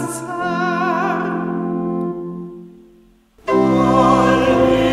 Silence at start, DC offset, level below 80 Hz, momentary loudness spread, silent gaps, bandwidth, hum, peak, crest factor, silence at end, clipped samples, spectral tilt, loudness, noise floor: 0 s; under 0.1%; -42 dBFS; 15 LU; none; 14 kHz; none; 0 dBFS; 18 dB; 0 s; under 0.1%; -6 dB/octave; -17 LUFS; -50 dBFS